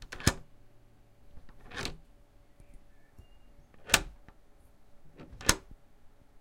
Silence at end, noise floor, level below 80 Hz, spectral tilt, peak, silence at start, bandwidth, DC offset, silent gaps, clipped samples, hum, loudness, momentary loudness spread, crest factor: 0.35 s; -59 dBFS; -48 dBFS; -2 dB/octave; -2 dBFS; 0 s; 16 kHz; under 0.1%; none; under 0.1%; none; -31 LUFS; 26 LU; 36 dB